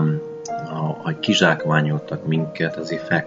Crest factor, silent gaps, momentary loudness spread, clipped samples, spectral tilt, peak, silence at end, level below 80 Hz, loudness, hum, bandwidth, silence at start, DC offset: 20 dB; none; 11 LU; under 0.1%; -5.5 dB/octave; 0 dBFS; 0 s; -62 dBFS; -21 LUFS; none; 7.8 kHz; 0 s; under 0.1%